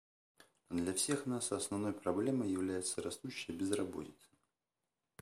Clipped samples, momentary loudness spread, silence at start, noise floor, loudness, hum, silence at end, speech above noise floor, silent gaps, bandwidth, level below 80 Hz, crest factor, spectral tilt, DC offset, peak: under 0.1%; 8 LU; 0.7 s; under -90 dBFS; -38 LUFS; none; 1.1 s; over 52 dB; none; 15.5 kHz; -72 dBFS; 20 dB; -4 dB/octave; under 0.1%; -18 dBFS